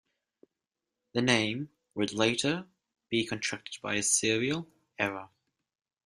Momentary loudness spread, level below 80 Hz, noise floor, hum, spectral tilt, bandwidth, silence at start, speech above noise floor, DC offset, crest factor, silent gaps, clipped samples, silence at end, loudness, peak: 12 LU; -70 dBFS; -88 dBFS; none; -3 dB/octave; 15 kHz; 1.15 s; 58 dB; under 0.1%; 26 dB; none; under 0.1%; 0.8 s; -30 LUFS; -8 dBFS